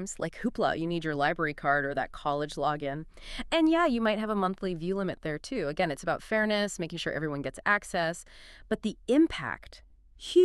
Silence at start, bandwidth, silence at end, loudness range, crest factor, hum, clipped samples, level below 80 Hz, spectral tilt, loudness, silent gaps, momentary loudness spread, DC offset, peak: 0 s; 12.5 kHz; 0 s; 2 LU; 20 dB; none; under 0.1%; -52 dBFS; -5 dB/octave; -30 LUFS; none; 11 LU; under 0.1%; -10 dBFS